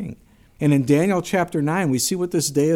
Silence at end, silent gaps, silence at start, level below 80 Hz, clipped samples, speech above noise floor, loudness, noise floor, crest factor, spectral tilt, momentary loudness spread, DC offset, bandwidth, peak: 0 s; none; 0 s; -54 dBFS; under 0.1%; 25 dB; -20 LUFS; -44 dBFS; 16 dB; -5 dB/octave; 5 LU; under 0.1%; 17 kHz; -6 dBFS